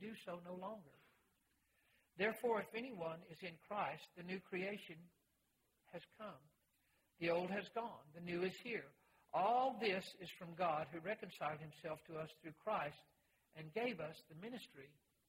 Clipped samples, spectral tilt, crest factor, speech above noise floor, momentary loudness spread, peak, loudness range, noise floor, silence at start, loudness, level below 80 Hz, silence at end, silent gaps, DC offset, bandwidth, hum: under 0.1%; -5.5 dB/octave; 20 dB; 38 dB; 17 LU; -26 dBFS; 7 LU; -83 dBFS; 0 s; -45 LUFS; -84 dBFS; 0.4 s; none; under 0.1%; 16 kHz; none